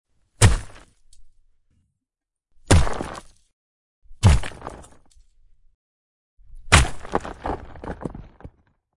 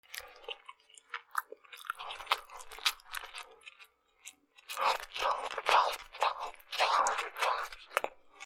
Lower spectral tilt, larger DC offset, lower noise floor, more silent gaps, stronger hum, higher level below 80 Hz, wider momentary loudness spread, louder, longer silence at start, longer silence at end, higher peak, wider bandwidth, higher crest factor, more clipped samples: first, -4.5 dB/octave vs 1.5 dB/octave; neither; first, -86 dBFS vs -62 dBFS; first, 3.53-4.02 s, 5.74-6.37 s vs none; neither; first, -30 dBFS vs -68 dBFS; about the same, 20 LU vs 22 LU; first, -21 LUFS vs -34 LUFS; first, 0.4 s vs 0.1 s; first, 0.5 s vs 0 s; first, 0 dBFS vs -8 dBFS; second, 11.5 kHz vs 18 kHz; about the same, 24 dB vs 28 dB; neither